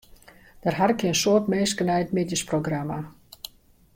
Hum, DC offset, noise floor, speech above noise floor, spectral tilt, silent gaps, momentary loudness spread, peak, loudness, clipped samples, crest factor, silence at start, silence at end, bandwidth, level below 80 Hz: none; under 0.1%; -52 dBFS; 28 dB; -4.5 dB/octave; none; 20 LU; -8 dBFS; -24 LUFS; under 0.1%; 18 dB; 0.65 s; 0.85 s; 16.5 kHz; -56 dBFS